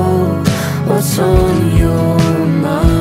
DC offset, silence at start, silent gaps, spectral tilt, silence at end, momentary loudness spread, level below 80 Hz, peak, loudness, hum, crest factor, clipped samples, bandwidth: under 0.1%; 0 s; none; -6.5 dB/octave; 0 s; 3 LU; -22 dBFS; 0 dBFS; -13 LUFS; none; 12 dB; under 0.1%; 16.5 kHz